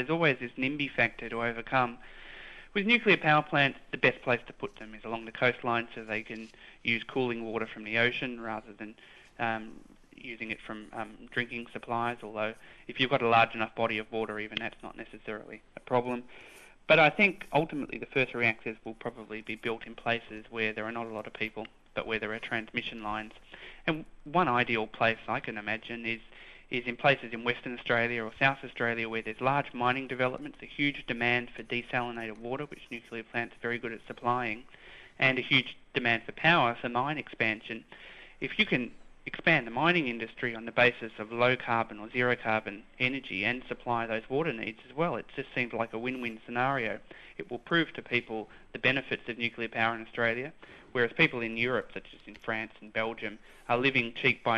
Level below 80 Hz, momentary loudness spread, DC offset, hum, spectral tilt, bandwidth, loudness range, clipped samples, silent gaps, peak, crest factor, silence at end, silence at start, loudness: -60 dBFS; 16 LU; under 0.1%; none; -6 dB/octave; 12 kHz; 7 LU; under 0.1%; none; -8 dBFS; 22 dB; 0 s; 0 s; -30 LUFS